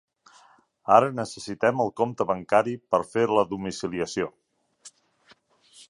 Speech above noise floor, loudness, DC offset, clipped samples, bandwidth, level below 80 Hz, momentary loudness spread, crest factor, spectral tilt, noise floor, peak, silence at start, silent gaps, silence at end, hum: 36 dB; -25 LUFS; under 0.1%; under 0.1%; 11.5 kHz; -62 dBFS; 12 LU; 24 dB; -5.5 dB/octave; -60 dBFS; -2 dBFS; 0.85 s; none; 0.05 s; none